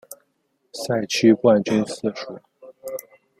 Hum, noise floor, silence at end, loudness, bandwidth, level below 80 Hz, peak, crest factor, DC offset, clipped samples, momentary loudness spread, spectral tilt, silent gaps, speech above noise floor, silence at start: none; -70 dBFS; 0.4 s; -20 LUFS; 16.5 kHz; -64 dBFS; -4 dBFS; 20 dB; under 0.1%; under 0.1%; 22 LU; -5 dB/octave; none; 50 dB; 0.1 s